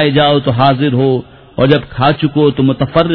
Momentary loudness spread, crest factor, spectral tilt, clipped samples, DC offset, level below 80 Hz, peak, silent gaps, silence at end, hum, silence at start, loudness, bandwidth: 4 LU; 12 dB; -10 dB/octave; 0.2%; under 0.1%; -40 dBFS; 0 dBFS; none; 0 s; none; 0 s; -12 LUFS; 5.4 kHz